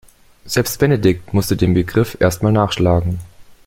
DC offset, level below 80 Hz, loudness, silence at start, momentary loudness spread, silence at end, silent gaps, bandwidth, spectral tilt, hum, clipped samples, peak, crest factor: under 0.1%; -38 dBFS; -16 LUFS; 0.45 s; 5 LU; 0.15 s; none; 17 kHz; -6 dB/octave; none; under 0.1%; 0 dBFS; 16 dB